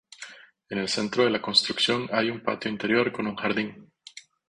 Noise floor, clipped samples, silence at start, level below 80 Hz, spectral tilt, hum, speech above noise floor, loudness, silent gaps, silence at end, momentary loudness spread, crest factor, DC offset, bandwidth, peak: -49 dBFS; under 0.1%; 0.2 s; -64 dBFS; -3.5 dB/octave; none; 23 dB; -25 LUFS; none; 0.3 s; 21 LU; 22 dB; under 0.1%; 11 kHz; -6 dBFS